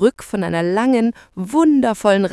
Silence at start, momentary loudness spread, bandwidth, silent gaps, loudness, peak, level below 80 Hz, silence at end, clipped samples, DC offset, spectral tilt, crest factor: 0 s; 7 LU; 12 kHz; none; -17 LUFS; -2 dBFS; -52 dBFS; 0 s; under 0.1%; under 0.1%; -6 dB/octave; 14 dB